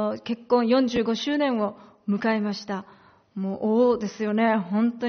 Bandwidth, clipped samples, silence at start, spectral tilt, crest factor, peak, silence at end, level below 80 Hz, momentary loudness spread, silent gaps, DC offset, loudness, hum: 6.6 kHz; under 0.1%; 0 s; -4.5 dB/octave; 16 dB; -10 dBFS; 0 s; -64 dBFS; 11 LU; none; under 0.1%; -24 LUFS; none